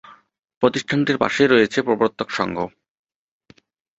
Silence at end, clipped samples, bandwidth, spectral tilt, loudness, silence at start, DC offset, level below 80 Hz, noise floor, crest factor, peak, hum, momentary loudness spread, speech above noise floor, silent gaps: 1.3 s; under 0.1%; 8 kHz; -5 dB/octave; -19 LUFS; 0.05 s; under 0.1%; -58 dBFS; -55 dBFS; 20 dB; -2 dBFS; none; 9 LU; 36 dB; 0.57-0.61 s